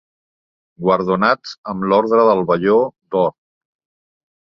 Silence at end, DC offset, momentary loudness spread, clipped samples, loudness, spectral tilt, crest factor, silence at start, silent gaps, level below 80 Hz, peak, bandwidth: 1.2 s; under 0.1%; 8 LU; under 0.1%; -16 LUFS; -7.5 dB/octave; 18 dB; 0.8 s; 1.58-1.63 s; -56 dBFS; -2 dBFS; 6.8 kHz